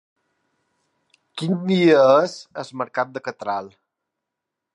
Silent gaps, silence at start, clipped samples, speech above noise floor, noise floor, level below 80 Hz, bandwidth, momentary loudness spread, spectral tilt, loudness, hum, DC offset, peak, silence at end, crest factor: none; 1.35 s; under 0.1%; 63 dB; -83 dBFS; -74 dBFS; 10.5 kHz; 17 LU; -6.5 dB/octave; -20 LUFS; none; under 0.1%; -4 dBFS; 1.05 s; 18 dB